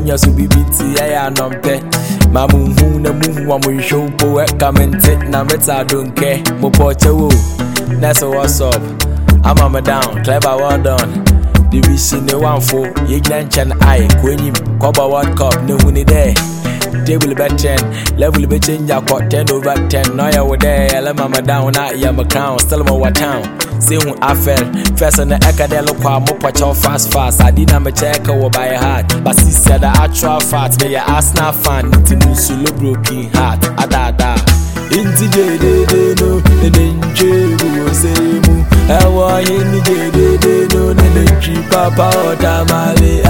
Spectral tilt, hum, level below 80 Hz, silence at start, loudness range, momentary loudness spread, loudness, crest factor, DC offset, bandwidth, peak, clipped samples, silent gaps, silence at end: -5 dB/octave; none; -16 dBFS; 0 s; 2 LU; 5 LU; -11 LUFS; 10 dB; 1%; 17.5 kHz; 0 dBFS; 0.1%; none; 0 s